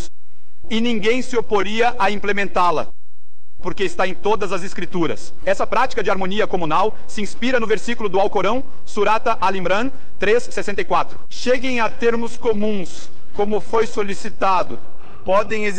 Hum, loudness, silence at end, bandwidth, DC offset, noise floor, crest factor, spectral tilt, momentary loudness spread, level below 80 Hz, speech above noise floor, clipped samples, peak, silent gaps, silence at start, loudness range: none; -20 LUFS; 0 s; 9.6 kHz; 20%; -61 dBFS; 12 dB; -4.5 dB/octave; 9 LU; -42 dBFS; 41 dB; under 0.1%; -6 dBFS; none; 0 s; 2 LU